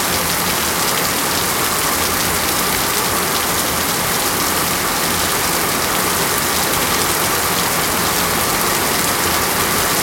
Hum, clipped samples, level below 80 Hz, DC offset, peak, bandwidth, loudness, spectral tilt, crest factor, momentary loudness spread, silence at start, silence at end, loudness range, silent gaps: none; under 0.1%; -40 dBFS; under 0.1%; 0 dBFS; 17 kHz; -15 LUFS; -2 dB/octave; 16 dB; 1 LU; 0 s; 0 s; 1 LU; none